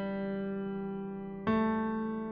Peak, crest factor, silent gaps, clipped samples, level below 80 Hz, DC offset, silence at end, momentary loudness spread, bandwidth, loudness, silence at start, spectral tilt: -18 dBFS; 16 dB; none; under 0.1%; -60 dBFS; under 0.1%; 0 s; 9 LU; 4.9 kHz; -34 LUFS; 0 s; -6.5 dB/octave